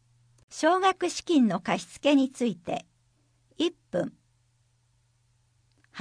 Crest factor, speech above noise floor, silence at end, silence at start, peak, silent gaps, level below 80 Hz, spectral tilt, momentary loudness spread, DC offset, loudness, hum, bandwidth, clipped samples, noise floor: 18 dB; 42 dB; 0 s; 0.5 s; -10 dBFS; none; -70 dBFS; -4.5 dB/octave; 13 LU; under 0.1%; -27 LUFS; none; 10.5 kHz; under 0.1%; -68 dBFS